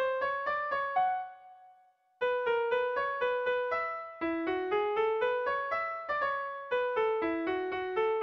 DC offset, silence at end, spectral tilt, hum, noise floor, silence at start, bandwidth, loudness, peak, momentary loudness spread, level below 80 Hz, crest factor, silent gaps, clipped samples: under 0.1%; 0 s; -5.5 dB/octave; none; -64 dBFS; 0 s; 6 kHz; -32 LUFS; -20 dBFS; 4 LU; -68 dBFS; 12 dB; none; under 0.1%